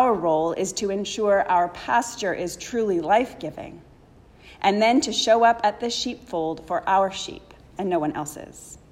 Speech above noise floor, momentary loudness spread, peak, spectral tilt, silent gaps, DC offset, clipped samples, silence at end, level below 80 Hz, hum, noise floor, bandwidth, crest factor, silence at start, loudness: 28 dB; 15 LU; -6 dBFS; -3.5 dB/octave; none; under 0.1%; under 0.1%; 0.15 s; -54 dBFS; none; -51 dBFS; 15.5 kHz; 18 dB; 0 s; -23 LUFS